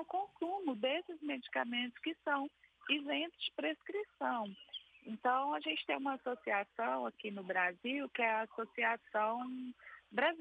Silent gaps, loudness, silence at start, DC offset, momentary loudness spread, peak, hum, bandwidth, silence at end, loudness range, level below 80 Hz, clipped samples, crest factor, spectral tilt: none; -38 LUFS; 0 s; under 0.1%; 10 LU; -20 dBFS; none; 8.8 kHz; 0 s; 2 LU; -86 dBFS; under 0.1%; 20 dB; -5.5 dB/octave